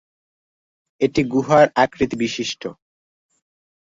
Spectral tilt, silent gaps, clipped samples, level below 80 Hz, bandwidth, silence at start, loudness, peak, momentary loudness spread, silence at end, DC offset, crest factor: -5 dB/octave; none; under 0.1%; -52 dBFS; 7.8 kHz; 1 s; -19 LUFS; -2 dBFS; 12 LU; 1.15 s; under 0.1%; 20 dB